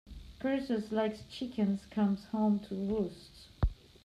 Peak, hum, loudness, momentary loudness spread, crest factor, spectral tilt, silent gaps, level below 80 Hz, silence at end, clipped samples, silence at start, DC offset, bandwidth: -18 dBFS; none; -34 LUFS; 9 LU; 16 dB; -8 dB/octave; none; -46 dBFS; 0.3 s; under 0.1%; 0.05 s; under 0.1%; 10 kHz